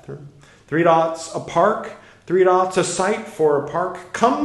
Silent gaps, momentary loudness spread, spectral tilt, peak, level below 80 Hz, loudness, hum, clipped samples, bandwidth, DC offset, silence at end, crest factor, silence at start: none; 12 LU; -5 dB/octave; 0 dBFS; -58 dBFS; -19 LUFS; none; under 0.1%; 12 kHz; under 0.1%; 0 s; 18 dB; 0.1 s